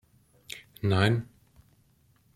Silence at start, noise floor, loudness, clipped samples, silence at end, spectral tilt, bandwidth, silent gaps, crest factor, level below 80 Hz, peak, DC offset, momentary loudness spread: 0.5 s; -65 dBFS; -27 LUFS; under 0.1%; 1.1 s; -6.5 dB/octave; 15 kHz; none; 22 dB; -62 dBFS; -8 dBFS; under 0.1%; 19 LU